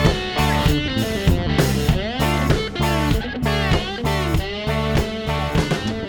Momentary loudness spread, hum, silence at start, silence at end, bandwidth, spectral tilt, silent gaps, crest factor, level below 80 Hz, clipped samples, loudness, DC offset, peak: 4 LU; none; 0 s; 0 s; over 20 kHz; -5.5 dB/octave; none; 16 dB; -26 dBFS; under 0.1%; -20 LUFS; under 0.1%; -2 dBFS